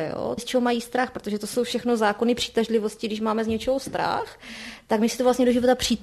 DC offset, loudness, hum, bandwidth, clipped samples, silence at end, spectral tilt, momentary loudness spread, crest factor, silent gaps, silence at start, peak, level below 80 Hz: under 0.1%; -24 LUFS; none; 13 kHz; under 0.1%; 0 s; -4 dB/octave; 9 LU; 16 dB; none; 0 s; -8 dBFS; -52 dBFS